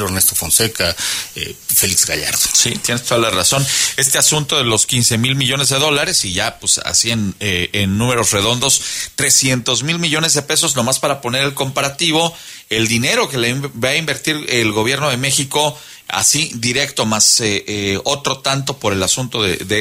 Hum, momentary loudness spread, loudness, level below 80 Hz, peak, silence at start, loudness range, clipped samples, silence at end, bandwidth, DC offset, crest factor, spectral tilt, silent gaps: none; 7 LU; -14 LUFS; -46 dBFS; 0 dBFS; 0 s; 3 LU; under 0.1%; 0 s; 16 kHz; under 0.1%; 16 dB; -2 dB/octave; none